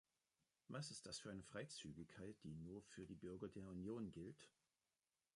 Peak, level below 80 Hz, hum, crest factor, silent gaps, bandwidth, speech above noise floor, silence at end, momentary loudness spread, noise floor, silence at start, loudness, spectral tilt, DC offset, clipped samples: -38 dBFS; -76 dBFS; none; 18 dB; none; 11 kHz; over 35 dB; 0.85 s; 6 LU; under -90 dBFS; 0.7 s; -55 LUFS; -5 dB/octave; under 0.1%; under 0.1%